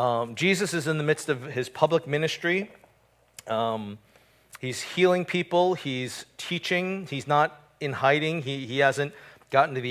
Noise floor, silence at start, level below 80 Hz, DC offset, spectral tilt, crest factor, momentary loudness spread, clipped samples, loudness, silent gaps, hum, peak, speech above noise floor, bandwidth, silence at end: -63 dBFS; 0 s; -68 dBFS; under 0.1%; -5 dB/octave; 22 dB; 11 LU; under 0.1%; -26 LUFS; none; none; -6 dBFS; 37 dB; 16 kHz; 0 s